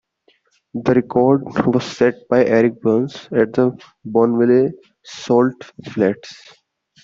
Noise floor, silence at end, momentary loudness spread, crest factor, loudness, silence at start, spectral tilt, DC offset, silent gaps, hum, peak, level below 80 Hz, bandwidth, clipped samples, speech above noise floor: -60 dBFS; 0.7 s; 16 LU; 16 dB; -17 LUFS; 0.75 s; -7 dB/octave; under 0.1%; none; none; -2 dBFS; -56 dBFS; 7.6 kHz; under 0.1%; 43 dB